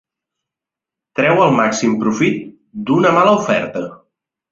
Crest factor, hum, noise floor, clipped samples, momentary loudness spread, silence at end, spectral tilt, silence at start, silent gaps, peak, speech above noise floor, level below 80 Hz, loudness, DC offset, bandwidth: 16 dB; none; -86 dBFS; under 0.1%; 15 LU; 0.6 s; -5.5 dB/octave; 1.15 s; none; -2 dBFS; 72 dB; -56 dBFS; -14 LUFS; under 0.1%; 7.8 kHz